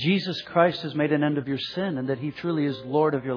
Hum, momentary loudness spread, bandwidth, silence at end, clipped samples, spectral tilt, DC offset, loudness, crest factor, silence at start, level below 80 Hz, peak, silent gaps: none; 6 LU; 5.4 kHz; 0 s; under 0.1%; -7.5 dB/octave; under 0.1%; -25 LUFS; 20 dB; 0 s; -66 dBFS; -6 dBFS; none